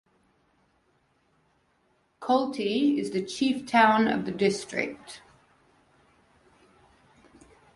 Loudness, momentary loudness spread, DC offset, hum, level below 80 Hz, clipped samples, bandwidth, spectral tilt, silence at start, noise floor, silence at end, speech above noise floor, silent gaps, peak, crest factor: -26 LUFS; 17 LU; under 0.1%; none; -68 dBFS; under 0.1%; 11.5 kHz; -4.5 dB/octave; 2.2 s; -69 dBFS; 2.55 s; 44 dB; none; -8 dBFS; 22 dB